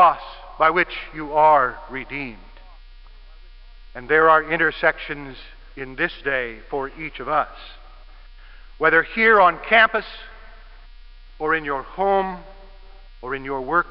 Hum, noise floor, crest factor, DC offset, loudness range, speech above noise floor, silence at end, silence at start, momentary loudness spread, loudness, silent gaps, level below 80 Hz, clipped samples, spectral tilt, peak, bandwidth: none; -42 dBFS; 20 dB; 0.1%; 8 LU; 22 dB; 0 s; 0 s; 22 LU; -20 LUFS; none; -42 dBFS; under 0.1%; -9 dB/octave; -2 dBFS; 5.6 kHz